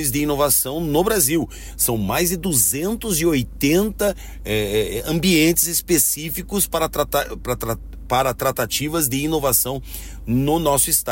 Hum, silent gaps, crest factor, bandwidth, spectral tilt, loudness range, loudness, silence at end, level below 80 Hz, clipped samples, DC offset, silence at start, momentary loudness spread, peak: none; none; 16 dB; 16.5 kHz; -3.5 dB/octave; 3 LU; -19 LUFS; 0 s; -36 dBFS; under 0.1%; under 0.1%; 0 s; 9 LU; -4 dBFS